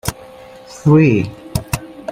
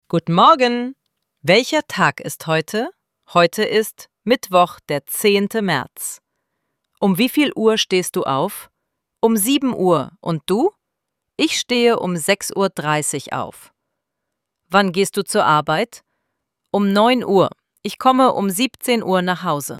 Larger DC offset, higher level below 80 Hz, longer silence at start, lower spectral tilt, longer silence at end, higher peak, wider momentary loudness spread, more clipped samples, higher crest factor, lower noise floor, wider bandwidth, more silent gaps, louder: neither; first, -38 dBFS vs -62 dBFS; about the same, 0.05 s vs 0.15 s; first, -6.5 dB/octave vs -4 dB/octave; about the same, 0 s vs 0 s; about the same, -2 dBFS vs -2 dBFS; first, 20 LU vs 12 LU; neither; about the same, 14 dB vs 18 dB; second, -38 dBFS vs -79 dBFS; about the same, 16 kHz vs 16.5 kHz; neither; about the same, -16 LUFS vs -18 LUFS